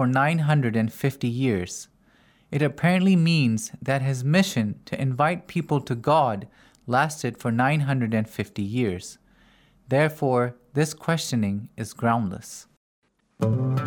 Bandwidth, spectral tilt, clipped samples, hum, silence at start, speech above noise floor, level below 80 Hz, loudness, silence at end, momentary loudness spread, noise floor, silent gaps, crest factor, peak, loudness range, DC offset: 19.5 kHz; -6 dB/octave; under 0.1%; none; 0 s; 36 dB; -62 dBFS; -24 LUFS; 0 s; 11 LU; -59 dBFS; 12.77-13.02 s; 18 dB; -6 dBFS; 3 LU; under 0.1%